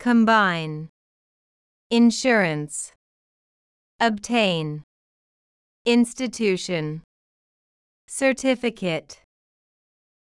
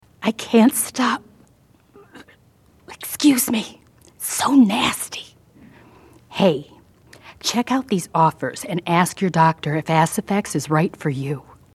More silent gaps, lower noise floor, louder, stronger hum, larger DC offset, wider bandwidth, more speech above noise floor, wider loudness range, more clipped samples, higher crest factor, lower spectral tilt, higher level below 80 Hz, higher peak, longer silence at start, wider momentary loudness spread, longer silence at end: first, 0.89-1.90 s, 2.96-3.99 s, 4.83-5.85 s, 7.04-8.08 s vs none; first, under -90 dBFS vs -55 dBFS; about the same, -22 LUFS vs -20 LUFS; neither; neither; second, 12 kHz vs 13.5 kHz; first, over 69 dB vs 36 dB; about the same, 4 LU vs 4 LU; neither; about the same, 18 dB vs 20 dB; about the same, -4.5 dB/octave vs -4.5 dB/octave; second, -64 dBFS vs -58 dBFS; second, -6 dBFS vs 0 dBFS; second, 0 s vs 0.2 s; about the same, 15 LU vs 13 LU; first, 1.1 s vs 0.35 s